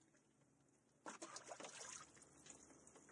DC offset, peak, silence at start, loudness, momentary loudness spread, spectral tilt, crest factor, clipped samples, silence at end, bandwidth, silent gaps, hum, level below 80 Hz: under 0.1%; -40 dBFS; 0 s; -57 LUFS; 10 LU; -1.5 dB/octave; 20 dB; under 0.1%; 0 s; 12 kHz; none; none; under -90 dBFS